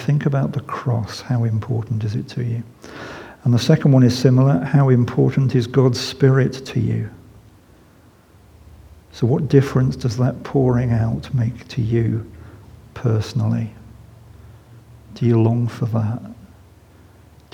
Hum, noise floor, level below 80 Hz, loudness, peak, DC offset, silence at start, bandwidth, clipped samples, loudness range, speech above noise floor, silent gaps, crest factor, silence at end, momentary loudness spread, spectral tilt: none; -50 dBFS; -48 dBFS; -19 LUFS; 0 dBFS; under 0.1%; 0 s; 10 kHz; under 0.1%; 8 LU; 32 dB; none; 20 dB; 1.2 s; 11 LU; -7.5 dB/octave